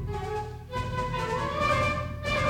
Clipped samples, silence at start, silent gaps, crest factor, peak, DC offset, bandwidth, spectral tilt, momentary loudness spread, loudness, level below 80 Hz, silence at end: under 0.1%; 0 s; none; 16 dB; -14 dBFS; under 0.1%; 17 kHz; -5.5 dB/octave; 9 LU; -29 LUFS; -42 dBFS; 0 s